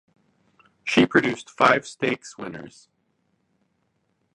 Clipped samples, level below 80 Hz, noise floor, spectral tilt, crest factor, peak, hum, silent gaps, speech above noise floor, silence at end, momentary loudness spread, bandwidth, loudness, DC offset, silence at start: under 0.1%; -64 dBFS; -71 dBFS; -4.5 dB/octave; 24 dB; -2 dBFS; none; none; 49 dB; 1.65 s; 18 LU; 11 kHz; -22 LUFS; under 0.1%; 0.85 s